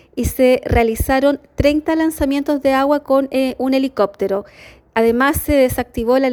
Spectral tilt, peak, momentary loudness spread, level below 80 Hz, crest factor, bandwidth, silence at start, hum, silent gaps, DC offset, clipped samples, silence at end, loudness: -5.5 dB/octave; -2 dBFS; 5 LU; -32 dBFS; 14 dB; over 20 kHz; 0.15 s; none; none; under 0.1%; under 0.1%; 0 s; -16 LUFS